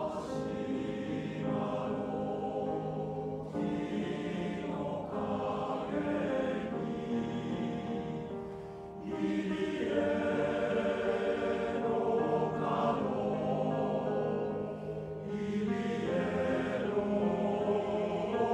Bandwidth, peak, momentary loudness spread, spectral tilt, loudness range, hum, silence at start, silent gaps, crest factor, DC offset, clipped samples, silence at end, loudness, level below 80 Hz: 10 kHz; -18 dBFS; 6 LU; -7.5 dB/octave; 4 LU; none; 0 s; none; 14 dB; under 0.1%; under 0.1%; 0 s; -34 LUFS; -60 dBFS